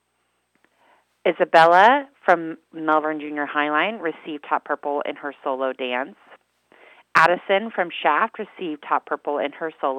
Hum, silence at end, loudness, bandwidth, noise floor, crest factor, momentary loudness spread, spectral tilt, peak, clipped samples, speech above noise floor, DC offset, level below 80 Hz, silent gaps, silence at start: none; 0 s; -21 LUFS; 13 kHz; -71 dBFS; 22 dB; 14 LU; -5 dB/octave; 0 dBFS; under 0.1%; 50 dB; under 0.1%; -80 dBFS; none; 1.25 s